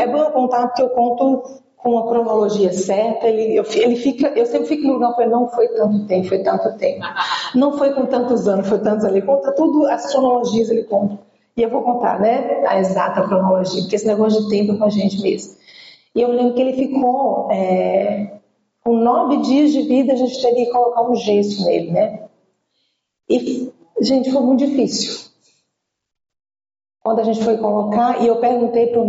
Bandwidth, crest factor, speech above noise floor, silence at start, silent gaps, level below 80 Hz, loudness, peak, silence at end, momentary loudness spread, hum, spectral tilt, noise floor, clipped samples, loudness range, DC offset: 8 kHz; 12 dB; 60 dB; 0 s; none; -64 dBFS; -17 LUFS; -4 dBFS; 0 s; 6 LU; none; -5 dB/octave; -76 dBFS; under 0.1%; 4 LU; under 0.1%